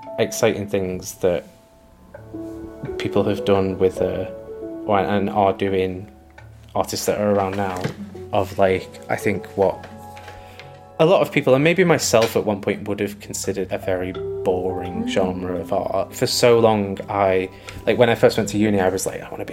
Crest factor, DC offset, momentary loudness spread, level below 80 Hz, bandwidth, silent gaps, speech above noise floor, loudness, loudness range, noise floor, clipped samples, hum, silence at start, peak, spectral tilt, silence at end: 20 dB; under 0.1%; 17 LU; -50 dBFS; 16.5 kHz; none; 29 dB; -20 LUFS; 5 LU; -49 dBFS; under 0.1%; none; 0 s; -2 dBFS; -5 dB/octave; 0 s